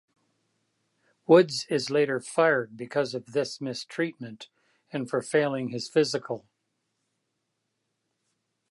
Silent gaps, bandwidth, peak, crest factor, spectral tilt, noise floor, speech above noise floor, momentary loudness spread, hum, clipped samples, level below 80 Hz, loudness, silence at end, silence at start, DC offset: none; 11.5 kHz; -6 dBFS; 24 dB; -5 dB/octave; -80 dBFS; 54 dB; 17 LU; none; under 0.1%; -80 dBFS; -26 LUFS; 2.3 s; 1.3 s; under 0.1%